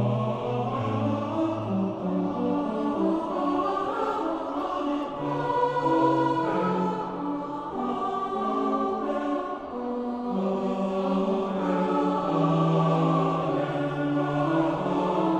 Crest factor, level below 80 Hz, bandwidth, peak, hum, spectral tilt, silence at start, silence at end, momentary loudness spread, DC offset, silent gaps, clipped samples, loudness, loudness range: 14 dB; -58 dBFS; 8.8 kHz; -12 dBFS; none; -8.5 dB/octave; 0 s; 0 s; 7 LU; under 0.1%; none; under 0.1%; -27 LUFS; 3 LU